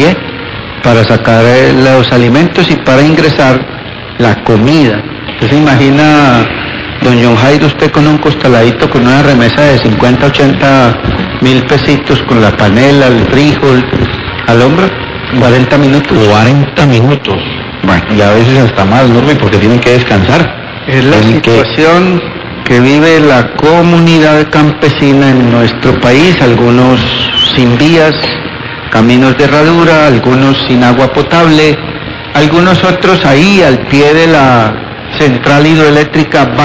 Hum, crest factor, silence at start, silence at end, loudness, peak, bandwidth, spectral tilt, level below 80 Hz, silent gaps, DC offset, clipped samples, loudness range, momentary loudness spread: none; 6 dB; 0 s; 0 s; -6 LUFS; 0 dBFS; 8 kHz; -6.5 dB/octave; -28 dBFS; none; 1%; 8%; 2 LU; 8 LU